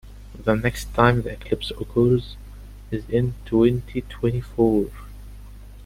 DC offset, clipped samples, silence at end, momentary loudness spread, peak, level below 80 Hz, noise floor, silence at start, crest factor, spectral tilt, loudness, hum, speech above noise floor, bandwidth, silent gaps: under 0.1%; under 0.1%; 0 s; 23 LU; -2 dBFS; -38 dBFS; -40 dBFS; 0.05 s; 20 dB; -7 dB/octave; -23 LUFS; 50 Hz at -35 dBFS; 19 dB; 16 kHz; none